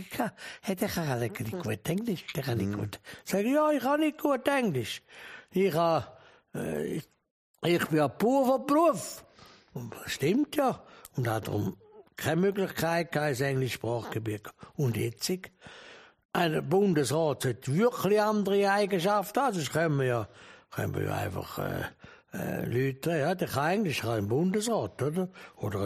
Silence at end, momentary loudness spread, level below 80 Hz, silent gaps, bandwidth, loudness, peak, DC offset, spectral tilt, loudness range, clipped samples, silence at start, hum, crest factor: 0 s; 14 LU; -64 dBFS; 7.31-7.54 s, 16.25-16.29 s; 15.5 kHz; -29 LUFS; -12 dBFS; under 0.1%; -5.5 dB/octave; 5 LU; under 0.1%; 0 s; none; 18 dB